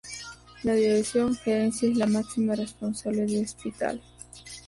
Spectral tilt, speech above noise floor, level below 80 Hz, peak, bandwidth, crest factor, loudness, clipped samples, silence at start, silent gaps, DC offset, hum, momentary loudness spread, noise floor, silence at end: -5 dB/octave; 20 dB; -56 dBFS; -14 dBFS; 11.5 kHz; 14 dB; -27 LUFS; under 0.1%; 0.05 s; none; under 0.1%; 60 Hz at -45 dBFS; 16 LU; -45 dBFS; 0.05 s